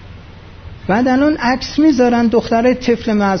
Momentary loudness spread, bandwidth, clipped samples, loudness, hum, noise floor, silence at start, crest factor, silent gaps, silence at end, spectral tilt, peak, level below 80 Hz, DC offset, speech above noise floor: 5 LU; 6.6 kHz; under 0.1%; -14 LUFS; none; -36 dBFS; 0 s; 12 dB; none; 0 s; -6 dB/octave; -2 dBFS; -38 dBFS; under 0.1%; 23 dB